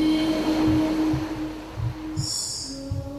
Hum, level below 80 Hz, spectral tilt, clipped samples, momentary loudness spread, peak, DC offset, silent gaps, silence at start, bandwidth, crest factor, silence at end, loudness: none; -42 dBFS; -5 dB/octave; under 0.1%; 10 LU; -12 dBFS; under 0.1%; none; 0 s; 14 kHz; 14 dB; 0 s; -25 LUFS